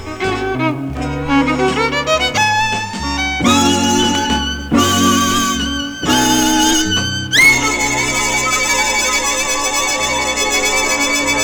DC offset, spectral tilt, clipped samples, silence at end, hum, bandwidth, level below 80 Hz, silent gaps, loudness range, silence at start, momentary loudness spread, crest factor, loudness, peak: under 0.1%; -2.5 dB/octave; under 0.1%; 0 s; none; over 20 kHz; -34 dBFS; none; 2 LU; 0 s; 7 LU; 14 dB; -14 LUFS; 0 dBFS